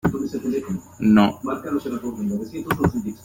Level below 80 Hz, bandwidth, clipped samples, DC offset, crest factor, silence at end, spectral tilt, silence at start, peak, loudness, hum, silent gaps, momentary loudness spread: -46 dBFS; 16.5 kHz; under 0.1%; under 0.1%; 20 dB; 0 s; -7 dB/octave; 0.05 s; -2 dBFS; -23 LUFS; none; none; 12 LU